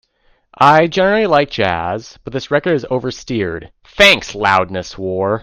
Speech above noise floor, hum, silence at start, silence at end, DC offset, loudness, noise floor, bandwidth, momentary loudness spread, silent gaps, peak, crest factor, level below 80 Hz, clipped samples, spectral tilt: 42 dB; none; 0.6 s; 0 s; under 0.1%; -14 LUFS; -57 dBFS; 16 kHz; 14 LU; none; 0 dBFS; 16 dB; -44 dBFS; under 0.1%; -4.5 dB/octave